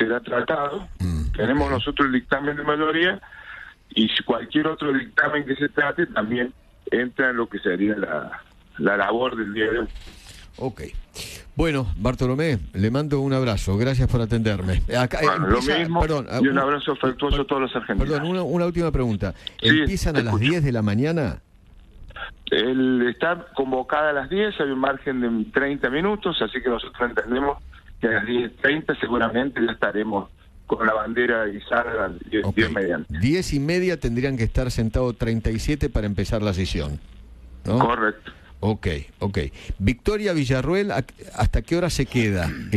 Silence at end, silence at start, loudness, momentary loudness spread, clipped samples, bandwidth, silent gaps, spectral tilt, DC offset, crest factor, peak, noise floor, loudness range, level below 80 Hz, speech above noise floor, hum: 0 s; 0 s; -23 LUFS; 9 LU; under 0.1%; 13.5 kHz; none; -6 dB/octave; under 0.1%; 20 dB; -2 dBFS; -49 dBFS; 3 LU; -36 dBFS; 27 dB; none